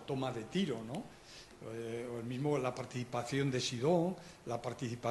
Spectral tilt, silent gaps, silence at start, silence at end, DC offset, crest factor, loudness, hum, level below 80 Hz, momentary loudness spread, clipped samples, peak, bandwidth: -5.5 dB/octave; none; 0 s; 0 s; under 0.1%; 18 dB; -38 LUFS; none; -68 dBFS; 14 LU; under 0.1%; -20 dBFS; 12 kHz